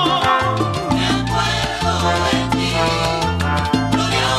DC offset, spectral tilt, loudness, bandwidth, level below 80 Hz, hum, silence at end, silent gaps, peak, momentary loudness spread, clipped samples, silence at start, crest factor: under 0.1%; -4.5 dB/octave; -17 LUFS; 14 kHz; -32 dBFS; none; 0 s; none; -2 dBFS; 3 LU; under 0.1%; 0 s; 16 dB